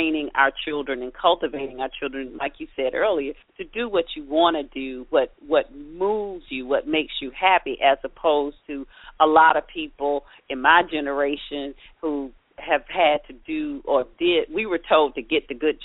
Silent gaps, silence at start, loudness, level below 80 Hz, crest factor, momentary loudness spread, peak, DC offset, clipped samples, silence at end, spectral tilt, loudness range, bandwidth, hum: none; 0 s; -23 LUFS; -50 dBFS; 20 dB; 14 LU; -2 dBFS; under 0.1%; under 0.1%; 0 s; -0.5 dB/octave; 4 LU; 4 kHz; none